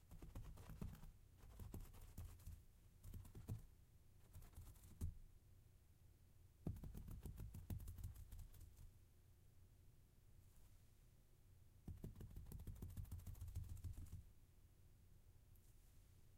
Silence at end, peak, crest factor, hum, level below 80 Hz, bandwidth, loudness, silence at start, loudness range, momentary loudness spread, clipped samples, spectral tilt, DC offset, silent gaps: 0 s; -36 dBFS; 22 dB; none; -62 dBFS; 16 kHz; -59 LUFS; 0 s; 6 LU; 11 LU; under 0.1%; -6.5 dB/octave; under 0.1%; none